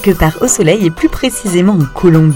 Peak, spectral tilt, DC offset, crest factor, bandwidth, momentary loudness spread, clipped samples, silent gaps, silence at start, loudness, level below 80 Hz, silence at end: 0 dBFS; -5.5 dB/octave; under 0.1%; 10 dB; 17.5 kHz; 4 LU; 0.3%; none; 0 s; -11 LUFS; -26 dBFS; 0 s